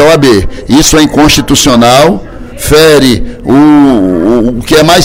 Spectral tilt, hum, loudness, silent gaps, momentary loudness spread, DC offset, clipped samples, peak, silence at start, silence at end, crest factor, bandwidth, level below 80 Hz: -4 dB/octave; none; -5 LUFS; none; 6 LU; under 0.1%; 8%; 0 dBFS; 0 s; 0 s; 4 dB; 20 kHz; -22 dBFS